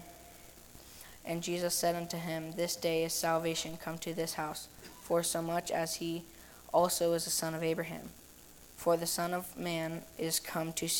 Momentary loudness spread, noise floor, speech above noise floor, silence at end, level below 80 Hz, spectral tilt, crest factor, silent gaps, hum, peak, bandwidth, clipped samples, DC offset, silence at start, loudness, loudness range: 21 LU; -56 dBFS; 21 dB; 0 s; -64 dBFS; -3.5 dB/octave; 20 dB; none; none; -16 dBFS; 18 kHz; under 0.1%; under 0.1%; 0 s; -34 LUFS; 2 LU